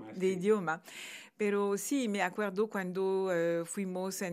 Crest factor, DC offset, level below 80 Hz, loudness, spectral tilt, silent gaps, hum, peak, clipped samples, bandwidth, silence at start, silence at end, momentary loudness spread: 18 dB; under 0.1%; under -90 dBFS; -33 LUFS; -5 dB/octave; none; none; -16 dBFS; under 0.1%; 15.5 kHz; 0 s; 0 s; 7 LU